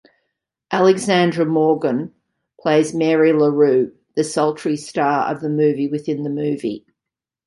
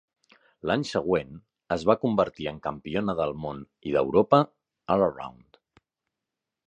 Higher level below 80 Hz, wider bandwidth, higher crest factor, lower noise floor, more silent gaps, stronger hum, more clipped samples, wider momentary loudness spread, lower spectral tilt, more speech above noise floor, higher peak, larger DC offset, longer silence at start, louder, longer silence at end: second, -64 dBFS vs -56 dBFS; first, 11.5 kHz vs 9.8 kHz; second, 16 dB vs 24 dB; about the same, -86 dBFS vs -87 dBFS; neither; neither; neither; second, 10 LU vs 15 LU; about the same, -6 dB/octave vs -7 dB/octave; first, 69 dB vs 61 dB; about the same, -2 dBFS vs -4 dBFS; neither; about the same, 0.7 s vs 0.65 s; first, -18 LUFS vs -26 LUFS; second, 0.7 s vs 1.4 s